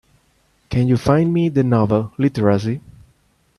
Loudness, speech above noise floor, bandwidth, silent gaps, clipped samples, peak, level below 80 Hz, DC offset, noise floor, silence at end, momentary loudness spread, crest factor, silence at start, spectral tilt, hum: -18 LUFS; 44 dB; 12 kHz; none; under 0.1%; -2 dBFS; -46 dBFS; under 0.1%; -60 dBFS; 0.8 s; 8 LU; 18 dB; 0.7 s; -8.5 dB/octave; none